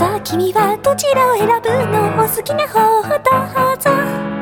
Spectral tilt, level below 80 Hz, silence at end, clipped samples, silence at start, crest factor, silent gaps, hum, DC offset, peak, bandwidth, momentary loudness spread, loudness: -4.5 dB/octave; -48 dBFS; 0 s; under 0.1%; 0 s; 14 dB; none; none; under 0.1%; 0 dBFS; over 20 kHz; 4 LU; -14 LUFS